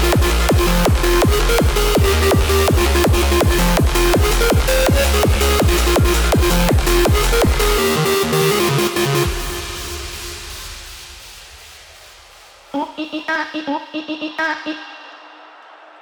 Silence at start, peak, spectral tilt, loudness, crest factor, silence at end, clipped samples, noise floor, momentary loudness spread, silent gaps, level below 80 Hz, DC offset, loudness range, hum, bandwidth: 0 s; -2 dBFS; -4.5 dB/octave; -16 LUFS; 14 dB; 0.75 s; under 0.1%; -43 dBFS; 14 LU; none; -20 dBFS; under 0.1%; 13 LU; none; over 20 kHz